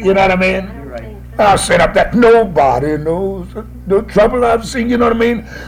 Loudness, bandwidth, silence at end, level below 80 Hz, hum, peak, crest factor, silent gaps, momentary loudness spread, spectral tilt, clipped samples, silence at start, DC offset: -12 LUFS; 15.5 kHz; 0 s; -30 dBFS; none; 0 dBFS; 12 dB; none; 17 LU; -5.5 dB/octave; under 0.1%; 0 s; under 0.1%